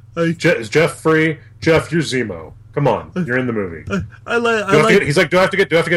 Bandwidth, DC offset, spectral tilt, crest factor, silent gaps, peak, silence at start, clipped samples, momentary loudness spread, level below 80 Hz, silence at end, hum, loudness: 15 kHz; under 0.1%; -5.5 dB/octave; 16 dB; none; 0 dBFS; 0.15 s; under 0.1%; 11 LU; -46 dBFS; 0 s; none; -16 LUFS